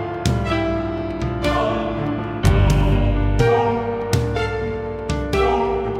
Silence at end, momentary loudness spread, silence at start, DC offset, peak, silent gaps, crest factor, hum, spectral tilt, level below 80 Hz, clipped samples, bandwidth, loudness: 0 s; 8 LU; 0 s; under 0.1%; -4 dBFS; none; 16 dB; none; -6.5 dB/octave; -26 dBFS; under 0.1%; 15 kHz; -20 LUFS